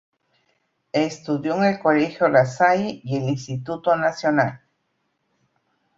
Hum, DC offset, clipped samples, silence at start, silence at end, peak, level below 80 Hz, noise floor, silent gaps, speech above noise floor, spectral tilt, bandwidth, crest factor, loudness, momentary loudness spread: none; under 0.1%; under 0.1%; 0.95 s; 1.4 s; -2 dBFS; -62 dBFS; -72 dBFS; none; 52 dB; -6.5 dB/octave; 7.8 kHz; 20 dB; -21 LUFS; 8 LU